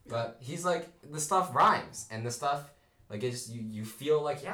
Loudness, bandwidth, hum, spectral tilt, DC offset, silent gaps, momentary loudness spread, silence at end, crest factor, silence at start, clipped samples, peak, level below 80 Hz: -31 LUFS; over 20 kHz; none; -4 dB/octave; under 0.1%; none; 14 LU; 0 s; 16 dB; 0.05 s; under 0.1%; -16 dBFS; -68 dBFS